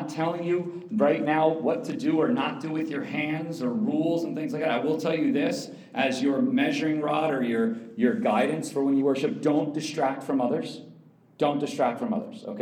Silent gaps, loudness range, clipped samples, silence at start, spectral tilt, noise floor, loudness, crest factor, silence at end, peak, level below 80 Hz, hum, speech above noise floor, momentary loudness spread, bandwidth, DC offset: none; 2 LU; under 0.1%; 0 s; -6 dB/octave; -53 dBFS; -26 LUFS; 18 dB; 0 s; -8 dBFS; -86 dBFS; none; 27 dB; 6 LU; 15.5 kHz; under 0.1%